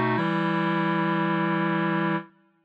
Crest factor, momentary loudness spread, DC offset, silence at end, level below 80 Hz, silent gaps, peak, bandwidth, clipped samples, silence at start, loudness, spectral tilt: 12 dB; 2 LU; under 0.1%; 0.4 s; -78 dBFS; none; -12 dBFS; 5.2 kHz; under 0.1%; 0 s; -25 LUFS; -8.5 dB/octave